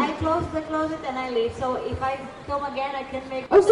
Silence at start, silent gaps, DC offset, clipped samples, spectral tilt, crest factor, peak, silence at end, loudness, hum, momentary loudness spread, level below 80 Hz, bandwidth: 0 s; none; under 0.1%; under 0.1%; -6 dB/octave; 16 dB; -6 dBFS; 0 s; -26 LUFS; none; 9 LU; -46 dBFS; 11 kHz